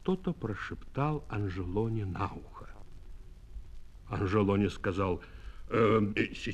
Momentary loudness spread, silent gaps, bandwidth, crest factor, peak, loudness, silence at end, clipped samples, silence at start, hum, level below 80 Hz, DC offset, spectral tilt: 23 LU; none; 9.4 kHz; 18 dB; -14 dBFS; -32 LUFS; 0 s; under 0.1%; 0 s; none; -48 dBFS; under 0.1%; -7.5 dB/octave